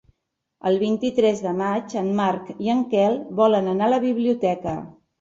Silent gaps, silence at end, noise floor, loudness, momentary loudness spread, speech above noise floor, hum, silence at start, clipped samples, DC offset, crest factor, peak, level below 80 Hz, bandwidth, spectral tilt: none; 0.3 s; -77 dBFS; -22 LUFS; 7 LU; 56 dB; none; 0.65 s; under 0.1%; under 0.1%; 16 dB; -6 dBFS; -60 dBFS; 7.8 kHz; -6.5 dB/octave